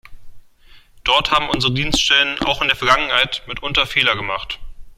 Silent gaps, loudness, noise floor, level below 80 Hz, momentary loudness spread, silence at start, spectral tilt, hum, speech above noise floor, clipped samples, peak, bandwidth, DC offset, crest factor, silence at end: none; -16 LUFS; -46 dBFS; -36 dBFS; 10 LU; 0.05 s; -2.5 dB/octave; none; 28 dB; under 0.1%; 0 dBFS; 16 kHz; under 0.1%; 18 dB; 0.05 s